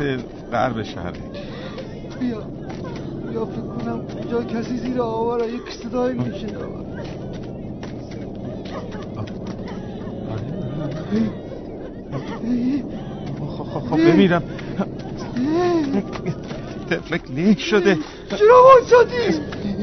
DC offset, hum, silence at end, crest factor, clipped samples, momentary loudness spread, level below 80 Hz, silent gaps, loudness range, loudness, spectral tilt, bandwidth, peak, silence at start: under 0.1%; none; 0 s; 20 dB; under 0.1%; 16 LU; -44 dBFS; none; 14 LU; -21 LUFS; -5.5 dB/octave; 6.4 kHz; 0 dBFS; 0 s